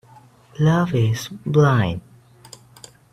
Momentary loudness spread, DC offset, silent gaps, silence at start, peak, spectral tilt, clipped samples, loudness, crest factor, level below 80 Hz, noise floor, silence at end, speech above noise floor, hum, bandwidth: 12 LU; under 0.1%; none; 0.6 s; -4 dBFS; -7 dB/octave; under 0.1%; -19 LUFS; 18 dB; -52 dBFS; -49 dBFS; 1.15 s; 31 dB; none; 14 kHz